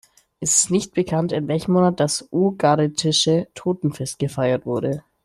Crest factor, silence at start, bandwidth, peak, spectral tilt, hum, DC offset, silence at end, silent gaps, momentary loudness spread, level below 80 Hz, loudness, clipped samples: 16 dB; 0.4 s; 14 kHz; -4 dBFS; -4.5 dB/octave; none; under 0.1%; 0.25 s; none; 8 LU; -56 dBFS; -20 LUFS; under 0.1%